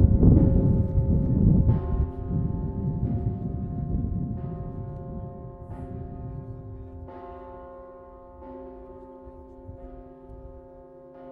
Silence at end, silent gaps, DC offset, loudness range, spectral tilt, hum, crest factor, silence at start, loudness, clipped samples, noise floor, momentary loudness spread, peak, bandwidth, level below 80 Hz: 0 s; none; under 0.1%; 20 LU; -13.5 dB/octave; none; 22 dB; 0 s; -26 LUFS; under 0.1%; -47 dBFS; 25 LU; -4 dBFS; 2.4 kHz; -32 dBFS